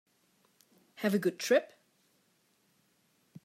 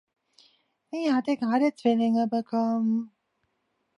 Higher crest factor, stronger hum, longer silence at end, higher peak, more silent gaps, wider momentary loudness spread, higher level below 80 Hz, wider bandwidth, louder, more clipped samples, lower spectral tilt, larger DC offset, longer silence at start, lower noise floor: first, 22 dB vs 16 dB; neither; first, 1.8 s vs 0.9 s; second, -14 dBFS vs -10 dBFS; neither; about the same, 9 LU vs 7 LU; second, -90 dBFS vs -80 dBFS; first, 16 kHz vs 10.5 kHz; second, -31 LUFS vs -26 LUFS; neither; second, -4.5 dB/octave vs -6.5 dB/octave; neither; about the same, 1 s vs 0.95 s; second, -72 dBFS vs -76 dBFS